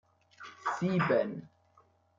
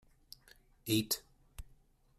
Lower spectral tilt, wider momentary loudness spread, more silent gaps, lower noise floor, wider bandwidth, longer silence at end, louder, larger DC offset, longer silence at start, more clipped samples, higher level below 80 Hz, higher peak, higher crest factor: first, -7 dB/octave vs -3.5 dB/octave; second, 21 LU vs 24 LU; neither; about the same, -67 dBFS vs -66 dBFS; second, 7.6 kHz vs 15.5 kHz; first, 0.7 s vs 0.55 s; first, -31 LUFS vs -36 LUFS; neither; second, 0.4 s vs 0.85 s; neither; second, -74 dBFS vs -60 dBFS; first, -14 dBFS vs -18 dBFS; about the same, 20 dB vs 24 dB